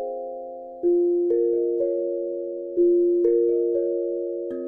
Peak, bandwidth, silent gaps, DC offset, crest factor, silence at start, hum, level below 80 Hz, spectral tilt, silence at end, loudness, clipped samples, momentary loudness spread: -10 dBFS; 1.9 kHz; none; under 0.1%; 12 dB; 0 s; none; -66 dBFS; -11 dB/octave; 0 s; -23 LUFS; under 0.1%; 11 LU